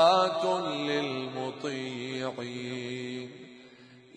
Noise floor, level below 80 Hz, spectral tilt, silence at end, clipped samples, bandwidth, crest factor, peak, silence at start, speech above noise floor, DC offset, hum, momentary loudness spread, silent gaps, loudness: -54 dBFS; -78 dBFS; -4.5 dB/octave; 0.15 s; under 0.1%; 10.5 kHz; 20 dB; -10 dBFS; 0 s; 21 dB; under 0.1%; none; 16 LU; none; -31 LUFS